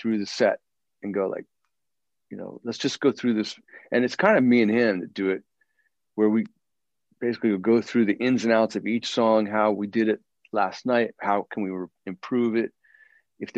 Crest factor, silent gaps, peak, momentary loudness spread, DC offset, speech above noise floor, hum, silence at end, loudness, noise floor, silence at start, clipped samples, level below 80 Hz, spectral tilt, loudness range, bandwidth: 18 dB; none; -6 dBFS; 15 LU; under 0.1%; 64 dB; none; 0 s; -24 LUFS; -87 dBFS; 0 s; under 0.1%; -74 dBFS; -5.5 dB/octave; 5 LU; 8 kHz